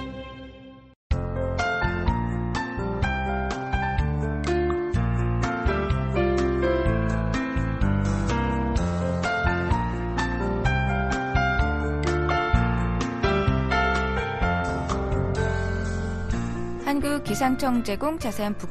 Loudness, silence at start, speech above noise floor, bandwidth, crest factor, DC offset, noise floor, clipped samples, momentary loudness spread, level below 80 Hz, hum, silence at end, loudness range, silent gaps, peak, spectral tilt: -25 LUFS; 0 s; 20 dB; 12.5 kHz; 16 dB; under 0.1%; -45 dBFS; under 0.1%; 5 LU; -30 dBFS; none; 0 s; 3 LU; 0.96-1.10 s; -8 dBFS; -6.5 dB/octave